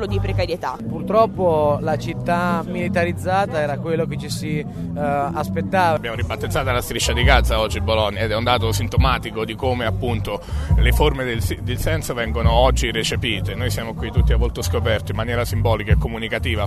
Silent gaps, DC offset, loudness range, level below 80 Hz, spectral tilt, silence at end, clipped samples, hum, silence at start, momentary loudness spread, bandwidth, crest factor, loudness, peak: none; under 0.1%; 3 LU; -26 dBFS; -5.5 dB/octave; 0 s; under 0.1%; none; 0 s; 8 LU; 13.5 kHz; 20 dB; -20 LUFS; 0 dBFS